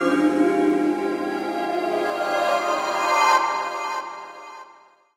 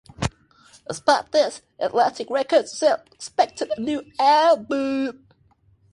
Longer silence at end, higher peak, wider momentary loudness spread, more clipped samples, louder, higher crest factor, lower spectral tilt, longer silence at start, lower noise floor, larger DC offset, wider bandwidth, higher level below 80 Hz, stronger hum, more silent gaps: second, 0.45 s vs 0.8 s; about the same, -6 dBFS vs -4 dBFS; first, 15 LU vs 12 LU; neither; about the same, -22 LUFS vs -22 LUFS; about the same, 18 dB vs 18 dB; about the same, -3.5 dB/octave vs -4 dB/octave; second, 0 s vs 0.2 s; second, -52 dBFS vs -60 dBFS; neither; first, 16 kHz vs 11.5 kHz; second, -68 dBFS vs -50 dBFS; neither; neither